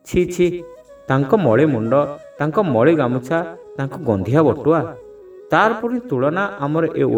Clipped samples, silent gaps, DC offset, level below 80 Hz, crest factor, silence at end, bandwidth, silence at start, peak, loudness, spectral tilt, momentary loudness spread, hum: under 0.1%; none; under 0.1%; -48 dBFS; 18 dB; 0 s; 19 kHz; 0.05 s; 0 dBFS; -18 LUFS; -7.5 dB/octave; 11 LU; none